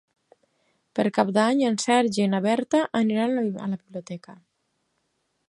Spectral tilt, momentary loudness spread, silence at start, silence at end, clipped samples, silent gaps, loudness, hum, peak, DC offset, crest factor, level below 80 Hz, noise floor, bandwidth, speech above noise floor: -5 dB/octave; 14 LU; 0.95 s; 1.15 s; under 0.1%; none; -23 LUFS; none; -4 dBFS; under 0.1%; 20 dB; -72 dBFS; -74 dBFS; 11.5 kHz; 51 dB